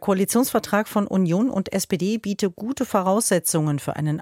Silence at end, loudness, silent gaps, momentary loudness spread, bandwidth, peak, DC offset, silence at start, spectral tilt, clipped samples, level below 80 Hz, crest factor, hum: 0 s; -22 LUFS; none; 6 LU; 16.5 kHz; -6 dBFS; under 0.1%; 0 s; -5 dB/octave; under 0.1%; -58 dBFS; 16 dB; none